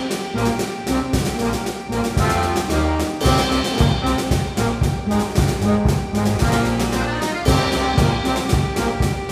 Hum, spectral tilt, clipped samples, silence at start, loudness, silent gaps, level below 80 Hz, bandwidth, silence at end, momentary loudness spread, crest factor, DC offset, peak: none; -5.5 dB/octave; under 0.1%; 0 s; -19 LUFS; none; -28 dBFS; 15.5 kHz; 0 s; 4 LU; 18 dB; under 0.1%; -2 dBFS